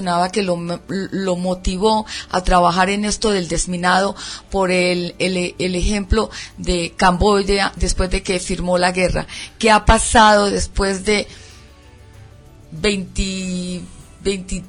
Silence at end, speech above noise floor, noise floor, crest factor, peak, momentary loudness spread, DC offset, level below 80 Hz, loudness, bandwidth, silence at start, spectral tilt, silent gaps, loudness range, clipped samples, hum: 0 s; 26 dB; -43 dBFS; 18 dB; 0 dBFS; 11 LU; under 0.1%; -28 dBFS; -18 LUFS; 11 kHz; 0 s; -4 dB/octave; none; 7 LU; under 0.1%; none